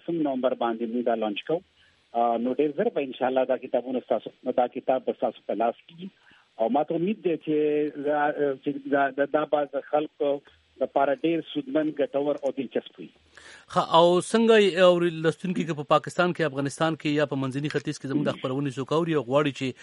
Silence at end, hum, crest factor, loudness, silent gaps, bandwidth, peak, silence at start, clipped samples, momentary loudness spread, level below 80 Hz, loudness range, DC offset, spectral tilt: 0 s; none; 22 dB; -26 LUFS; none; 11.5 kHz; -4 dBFS; 0.1 s; under 0.1%; 10 LU; -72 dBFS; 6 LU; under 0.1%; -6 dB/octave